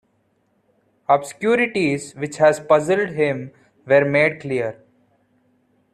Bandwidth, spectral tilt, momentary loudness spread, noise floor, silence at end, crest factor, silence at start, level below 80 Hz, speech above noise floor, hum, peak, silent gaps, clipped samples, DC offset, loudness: 12 kHz; -5.5 dB/octave; 13 LU; -65 dBFS; 1.2 s; 18 dB; 1.1 s; -62 dBFS; 47 dB; none; -2 dBFS; none; under 0.1%; under 0.1%; -19 LUFS